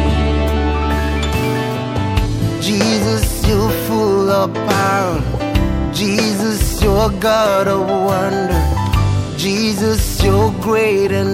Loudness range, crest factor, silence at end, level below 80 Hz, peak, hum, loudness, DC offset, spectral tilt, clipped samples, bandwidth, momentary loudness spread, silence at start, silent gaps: 1 LU; 14 dB; 0 s; -22 dBFS; 0 dBFS; none; -16 LUFS; under 0.1%; -5.5 dB/octave; under 0.1%; 16.5 kHz; 4 LU; 0 s; none